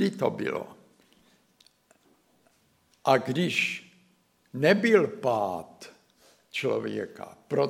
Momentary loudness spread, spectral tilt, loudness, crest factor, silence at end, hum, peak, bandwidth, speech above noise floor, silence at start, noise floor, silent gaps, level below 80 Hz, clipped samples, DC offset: 21 LU; -5.5 dB/octave; -27 LUFS; 22 dB; 0 s; none; -6 dBFS; 16 kHz; 40 dB; 0 s; -66 dBFS; none; -76 dBFS; under 0.1%; under 0.1%